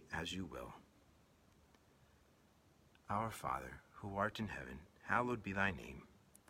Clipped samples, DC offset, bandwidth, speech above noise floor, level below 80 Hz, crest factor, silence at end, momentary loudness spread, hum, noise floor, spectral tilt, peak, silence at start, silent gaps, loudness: under 0.1%; under 0.1%; 16.5 kHz; 28 dB; -66 dBFS; 26 dB; 0.35 s; 16 LU; none; -70 dBFS; -5 dB/octave; -20 dBFS; 0 s; none; -42 LUFS